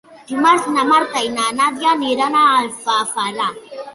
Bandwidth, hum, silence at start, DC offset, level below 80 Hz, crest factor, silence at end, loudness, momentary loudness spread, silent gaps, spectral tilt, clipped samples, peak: 11.5 kHz; none; 0.1 s; under 0.1%; -64 dBFS; 16 dB; 0 s; -16 LUFS; 8 LU; none; -2 dB/octave; under 0.1%; -2 dBFS